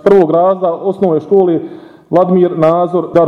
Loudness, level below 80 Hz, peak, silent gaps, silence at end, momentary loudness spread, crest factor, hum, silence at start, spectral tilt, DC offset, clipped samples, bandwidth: -12 LUFS; -52 dBFS; 0 dBFS; none; 0 s; 6 LU; 10 dB; none; 0.05 s; -9.5 dB/octave; under 0.1%; under 0.1%; 5.8 kHz